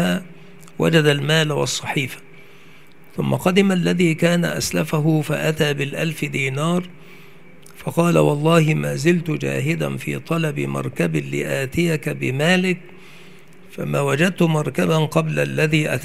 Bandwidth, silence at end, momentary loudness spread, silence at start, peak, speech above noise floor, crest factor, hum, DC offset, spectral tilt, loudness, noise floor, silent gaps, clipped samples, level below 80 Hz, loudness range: 15.5 kHz; 0 s; 9 LU; 0 s; -2 dBFS; 29 dB; 18 dB; none; 0.8%; -5.5 dB/octave; -19 LUFS; -48 dBFS; none; under 0.1%; -54 dBFS; 3 LU